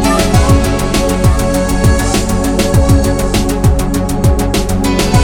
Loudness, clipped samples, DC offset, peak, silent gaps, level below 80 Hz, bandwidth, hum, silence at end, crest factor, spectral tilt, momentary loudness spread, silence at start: -12 LUFS; 0.2%; under 0.1%; 0 dBFS; none; -16 dBFS; 20 kHz; none; 0 s; 10 dB; -5.5 dB/octave; 4 LU; 0 s